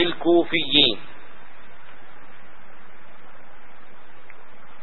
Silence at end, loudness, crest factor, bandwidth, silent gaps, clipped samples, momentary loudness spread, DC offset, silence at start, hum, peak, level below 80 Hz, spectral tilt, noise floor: 3.8 s; -19 LUFS; 24 dB; 4.3 kHz; none; under 0.1%; 18 LU; 5%; 0 s; none; -2 dBFS; -58 dBFS; -8.5 dB/octave; -50 dBFS